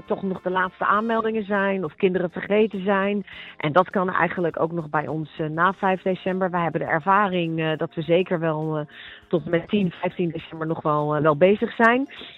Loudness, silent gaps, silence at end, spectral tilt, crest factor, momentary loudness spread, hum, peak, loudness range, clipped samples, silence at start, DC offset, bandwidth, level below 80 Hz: -23 LUFS; none; 0 s; -8.5 dB/octave; 20 dB; 9 LU; none; -4 dBFS; 2 LU; under 0.1%; 0.1 s; under 0.1%; 6.6 kHz; -60 dBFS